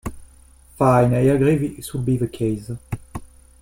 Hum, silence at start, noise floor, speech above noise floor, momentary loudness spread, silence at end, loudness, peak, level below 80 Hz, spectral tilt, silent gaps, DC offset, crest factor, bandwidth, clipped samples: none; 0.05 s; -49 dBFS; 30 dB; 17 LU; 0.35 s; -19 LUFS; -2 dBFS; -42 dBFS; -8 dB/octave; none; under 0.1%; 18 dB; 16.5 kHz; under 0.1%